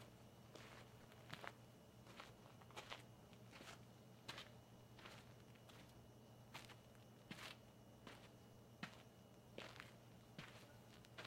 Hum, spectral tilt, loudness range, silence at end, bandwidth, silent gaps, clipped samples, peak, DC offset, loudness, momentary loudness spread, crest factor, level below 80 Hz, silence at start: none; -4 dB/octave; 1 LU; 0 s; 16 kHz; none; under 0.1%; -32 dBFS; under 0.1%; -60 LUFS; 9 LU; 30 dB; -80 dBFS; 0 s